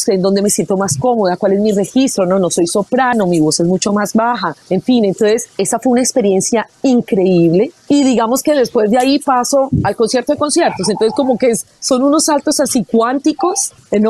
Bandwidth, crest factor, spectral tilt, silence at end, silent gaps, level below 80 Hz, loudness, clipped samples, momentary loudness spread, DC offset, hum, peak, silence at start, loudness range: 13.5 kHz; 10 dB; -4.5 dB/octave; 0 s; none; -48 dBFS; -13 LUFS; under 0.1%; 3 LU; under 0.1%; none; -2 dBFS; 0 s; 1 LU